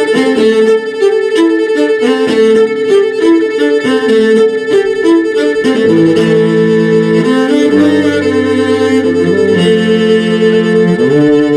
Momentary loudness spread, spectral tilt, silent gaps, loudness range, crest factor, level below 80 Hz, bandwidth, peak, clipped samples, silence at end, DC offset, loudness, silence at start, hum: 3 LU; -6 dB/octave; none; 1 LU; 8 dB; -50 dBFS; 11 kHz; 0 dBFS; under 0.1%; 0 s; under 0.1%; -9 LUFS; 0 s; none